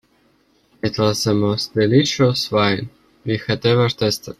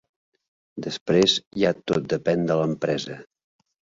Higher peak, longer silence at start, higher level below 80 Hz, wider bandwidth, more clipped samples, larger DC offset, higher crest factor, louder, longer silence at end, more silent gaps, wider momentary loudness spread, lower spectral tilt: first, -2 dBFS vs -6 dBFS; about the same, 0.85 s vs 0.75 s; first, -52 dBFS vs -60 dBFS; first, 14 kHz vs 7.8 kHz; neither; neither; about the same, 16 dB vs 20 dB; first, -18 LUFS vs -23 LUFS; second, 0.05 s vs 0.75 s; second, none vs 1.01-1.06 s, 1.47-1.51 s; second, 10 LU vs 16 LU; about the same, -5.5 dB/octave vs -5 dB/octave